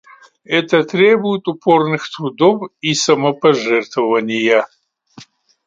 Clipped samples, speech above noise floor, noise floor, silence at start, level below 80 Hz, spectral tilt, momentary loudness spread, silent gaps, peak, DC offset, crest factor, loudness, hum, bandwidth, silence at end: under 0.1%; 28 dB; -43 dBFS; 0.5 s; -64 dBFS; -4.5 dB/octave; 7 LU; none; 0 dBFS; under 0.1%; 16 dB; -15 LUFS; none; 9.2 kHz; 0.45 s